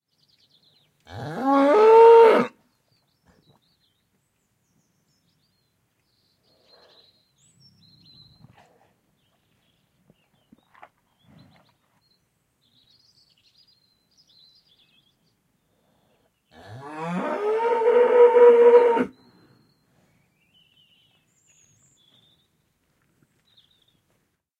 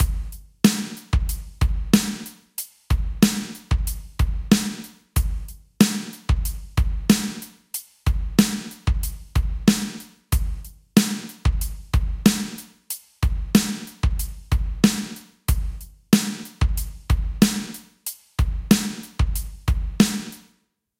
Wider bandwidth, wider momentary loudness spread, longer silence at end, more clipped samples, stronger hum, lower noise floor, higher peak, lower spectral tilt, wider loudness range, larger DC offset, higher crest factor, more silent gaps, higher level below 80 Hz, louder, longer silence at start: second, 7 kHz vs 17 kHz; first, 23 LU vs 13 LU; first, 5.5 s vs 0.6 s; neither; neither; first, -71 dBFS vs -66 dBFS; second, -4 dBFS vs 0 dBFS; first, -6.5 dB/octave vs -5 dB/octave; first, 15 LU vs 1 LU; neither; about the same, 22 dB vs 22 dB; neither; second, -76 dBFS vs -26 dBFS; first, -16 LUFS vs -23 LUFS; first, 1.1 s vs 0 s